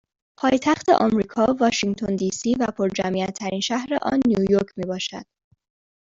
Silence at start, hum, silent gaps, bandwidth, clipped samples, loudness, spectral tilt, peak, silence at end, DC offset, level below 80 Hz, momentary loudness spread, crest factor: 0.4 s; none; none; 7.8 kHz; under 0.1%; -22 LUFS; -5 dB/octave; -4 dBFS; 0.8 s; under 0.1%; -54 dBFS; 9 LU; 18 dB